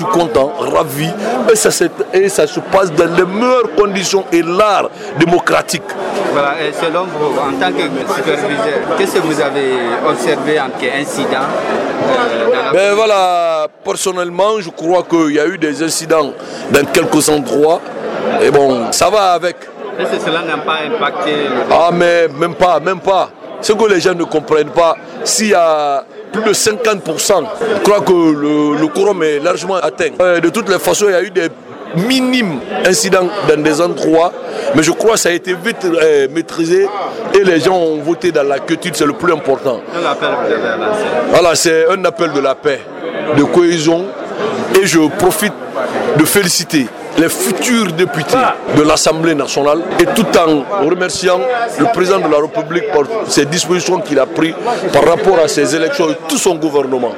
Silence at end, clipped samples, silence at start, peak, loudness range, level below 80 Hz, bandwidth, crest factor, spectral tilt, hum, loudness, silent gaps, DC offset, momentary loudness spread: 0 s; under 0.1%; 0 s; 0 dBFS; 2 LU; -48 dBFS; 16.5 kHz; 12 dB; -4 dB/octave; none; -13 LUFS; none; under 0.1%; 7 LU